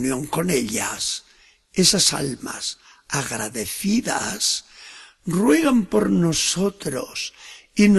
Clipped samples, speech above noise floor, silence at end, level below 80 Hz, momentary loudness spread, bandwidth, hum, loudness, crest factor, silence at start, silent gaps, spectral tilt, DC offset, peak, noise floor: under 0.1%; 32 dB; 0 s; -52 dBFS; 13 LU; 12.5 kHz; none; -21 LUFS; 20 dB; 0 s; none; -3.5 dB/octave; under 0.1%; -2 dBFS; -54 dBFS